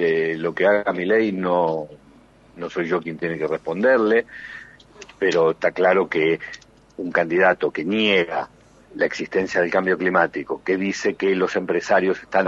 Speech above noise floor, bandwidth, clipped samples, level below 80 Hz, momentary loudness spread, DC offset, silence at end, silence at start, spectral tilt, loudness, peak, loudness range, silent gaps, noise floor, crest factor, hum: 30 dB; 7.8 kHz; under 0.1%; -60 dBFS; 12 LU; under 0.1%; 0 s; 0 s; -5.5 dB/octave; -21 LUFS; -2 dBFS; 3 LU; none; -51 dBFS; 20 dB; none